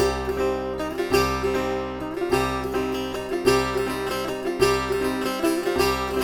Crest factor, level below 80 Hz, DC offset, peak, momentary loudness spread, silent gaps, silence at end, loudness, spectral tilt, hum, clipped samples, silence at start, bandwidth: 18 dB; -40 dBFS; under 0.1%; -6 dBFS; 6 LU; none; 0 s; -24 LUFS; -4.5 dB/octave; none; under 0.1%; 0 s; 19.5 kHz